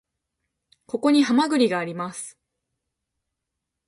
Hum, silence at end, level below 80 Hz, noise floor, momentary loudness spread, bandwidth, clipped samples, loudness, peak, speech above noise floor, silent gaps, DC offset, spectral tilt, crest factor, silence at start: none; 1.55 s; -72 dBFS; -83 dBFS; 16 LU; 11.5 kHz; under 0.1%; -22 LUFS; -8 dBFS; 62 dB; none; under 0.1%; -4.5 dB/octave; 18 dB; 0.95 s